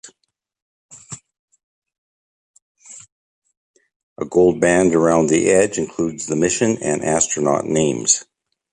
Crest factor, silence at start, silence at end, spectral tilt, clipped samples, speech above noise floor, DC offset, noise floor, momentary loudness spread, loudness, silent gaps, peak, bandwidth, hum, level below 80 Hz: 18 dB; 0.05 s; 0.5 s; -4 dB/octave; under 0.1%; 57 dB; under 0.1%; -73 dBFS; 21 LU; -17 LUFS; 0.62-0.89 s, 1.39-1.48 s, 1.63-1.82 s, 1.98-2.54 s, 2.62-2.75 s, 3.12-3.42 s, 3.57-3.74 s, 3.96-4.16 s; -2 dBFS; 11.5 kHz; none; -52 dBFS